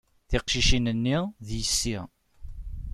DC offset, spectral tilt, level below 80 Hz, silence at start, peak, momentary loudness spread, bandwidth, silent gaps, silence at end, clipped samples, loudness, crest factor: under 0.1%; -3.5 dB/octave; -34 dBFS; 0.3 s; -10 dBFS; 19 LU; 14.5 kHz; none; 0 s; under 0.1%; -26 LUFS; 18 dB